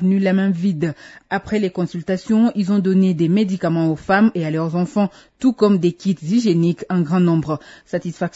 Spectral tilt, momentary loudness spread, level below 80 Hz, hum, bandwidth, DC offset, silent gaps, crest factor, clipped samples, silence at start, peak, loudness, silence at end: -8 dB/octave; 9 LU; -54 dBFS; none; 8 kHz; under 0.1%; none; 14 dB; under 0.1%; 0 s; -2 dBFS; -18 LUFS; 0.05 s